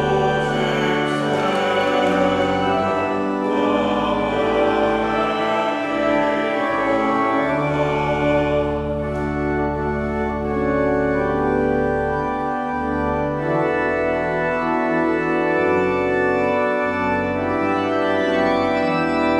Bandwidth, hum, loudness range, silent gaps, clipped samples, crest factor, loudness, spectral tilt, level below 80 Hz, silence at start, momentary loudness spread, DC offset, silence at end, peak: 11.5 kHz; none; 2 LU; none; under 0.1%; 14 dB; -20 LUFS; -6.5 dB/octave; -40 dBFS; 0 s; 4 LU; under 0.1%; 0 s; -6 dBFS